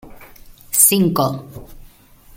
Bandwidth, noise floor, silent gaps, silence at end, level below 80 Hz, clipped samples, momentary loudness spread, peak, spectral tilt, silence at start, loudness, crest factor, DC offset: 17 kHz; -46 dBFS; none; 0.5 s; -46 dBFS; under 0.1%; 12 LU; 0 dBFS; -3.5 dB/octave; 0.05 s; -14 LUFS; 20 dB; under 0.1%